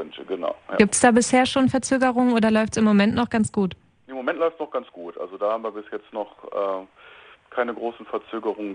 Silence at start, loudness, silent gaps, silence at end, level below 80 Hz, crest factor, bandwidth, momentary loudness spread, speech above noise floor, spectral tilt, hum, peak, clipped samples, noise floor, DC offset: 0 s; -22 LUFS; none; 0 s; -56 dBFS; 20 dB; 10.5 kHz; 15 LU; 26 dB; -4.5 dB/octave; none; -2 dBFS; under 0.1%; -48 dBFS; under 0.1%